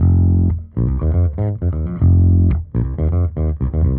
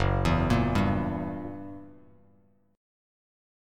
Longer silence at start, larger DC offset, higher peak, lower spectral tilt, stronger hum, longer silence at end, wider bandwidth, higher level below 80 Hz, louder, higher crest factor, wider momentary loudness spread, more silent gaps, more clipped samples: about the same, 0 s vs 0 s; neither; first, -4 dBFS vs -12 dBFS; first, -13.5 dB/octave vs -7.5 dB/octave; neither; second, 0 s vs 1.8 s; second, 2.4 kHz vs 13 kHz; first, -22 dBFS vs -40 dBFS; first, -17 LUFS vs -28 LUFS; second, 10 dB vs 18 dB; second, 7 LU vs 18 LU; neither; neither